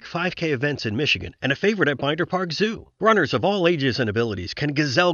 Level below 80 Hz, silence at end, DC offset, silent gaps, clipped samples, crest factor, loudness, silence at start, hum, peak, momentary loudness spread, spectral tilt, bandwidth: -54 dBFS; 0 s; under 0.1%; none; under 0.1%; 18 dB; -22 LUFS; 0.05 s; none; -4 dBFS; 6 LU; -5.5 dB/octave; 7.4 kHz